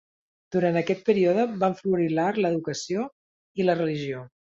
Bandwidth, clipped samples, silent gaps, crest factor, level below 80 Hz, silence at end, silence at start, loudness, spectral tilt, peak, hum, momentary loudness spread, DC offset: 7.8 kHz; under 0.1%; 3.12-3.55 s; 18 dB; -68 dBFS; 0.3 s; 0.5 s; -25 LUFS; -6.5 dB/octave; -8 dBFS; none; 10 LU; under 0.1%